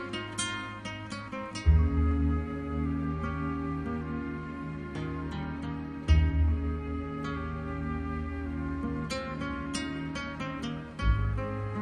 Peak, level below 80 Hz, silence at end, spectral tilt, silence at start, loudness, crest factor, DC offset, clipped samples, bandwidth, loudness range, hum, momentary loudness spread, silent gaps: -12 dBFS; -34 dBFS; 0 s; -6 dB/octave; 0 s; -32 LUFS; 18 dB; under 0.1%; under 0.1%; 10.5 kHz; 4 LU; none; 11 LU; none